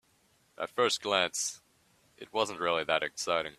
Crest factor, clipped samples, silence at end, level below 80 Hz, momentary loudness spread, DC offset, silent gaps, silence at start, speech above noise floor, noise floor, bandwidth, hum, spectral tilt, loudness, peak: 22 dB; under 0.1%; 0.05 s; -72 dBFS; 11 LU; under 0.1%; none; 0.6 s; 38 dB; -69 dBFS; 14.5 kHz; none; -1.5 dB/octave; -31 LUFS; -10 dBFS